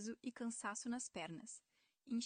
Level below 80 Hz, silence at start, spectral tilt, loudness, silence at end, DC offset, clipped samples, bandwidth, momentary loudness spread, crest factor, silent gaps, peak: -84 dBFS; 0 s; -3 dB/octave; -47 LUFS; 0 s; under 0.1%; under 0.1%; 9.6 kHz; 10 LU; 16 dB; none; -32 dBFS